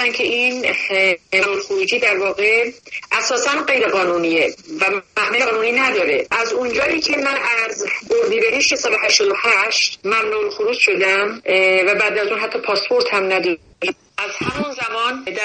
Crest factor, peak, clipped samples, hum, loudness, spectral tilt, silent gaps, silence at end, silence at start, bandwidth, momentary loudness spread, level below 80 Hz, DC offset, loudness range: 18 dB; 0 dBFS; under 0.1%; none; -16 LUFS; -1.5 dB/octave; none; 0 s; 0 s; 9.4 kHz; 8 LU; -56 dBFS; under 0.1%; 2 LU